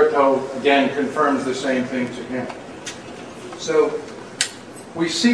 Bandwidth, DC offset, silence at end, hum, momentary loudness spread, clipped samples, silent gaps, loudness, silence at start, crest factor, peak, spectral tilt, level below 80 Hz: 11 kHz; 0.1%; 0 s; none; 17 LU; under 0.1%; none; -21 LUFS; 0 s; 20 dB; -2 dBFS; -3.5 dB/octave; -60 dBFS